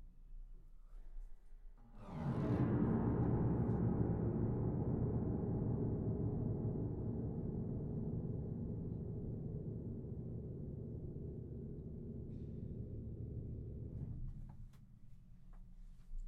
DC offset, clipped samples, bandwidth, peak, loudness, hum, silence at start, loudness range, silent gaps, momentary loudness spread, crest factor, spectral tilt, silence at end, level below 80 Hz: under 0.1%; under 0.1%; 3.9 kHz; -24 dBFS; -42 LUFS; none; 0 s; 11 LU; none; 22 LU; 18 dB; -12 dB/octave; 0 s; -52 dBFS